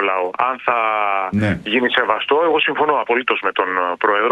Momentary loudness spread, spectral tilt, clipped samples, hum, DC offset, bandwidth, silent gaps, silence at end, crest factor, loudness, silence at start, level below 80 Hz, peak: 3 LU; -6.5 dB/octave; under 0.1%; none; under 0.1%; 9.6 kHz; none; 0 s; 18 dB; -17 LUFS; 0 s; -54 dBFS; 0 dBFS